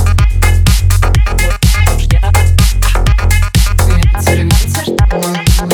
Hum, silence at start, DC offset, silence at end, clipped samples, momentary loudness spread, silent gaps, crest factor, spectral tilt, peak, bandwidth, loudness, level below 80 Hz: none; 0 s; under 0.1%; 0 s; under 0.1%; 2 LU; none; 8 dB; -4.5 dB/octave; 0 dBFS; 19.5 kHz; -11 LUFS; -10 dBFS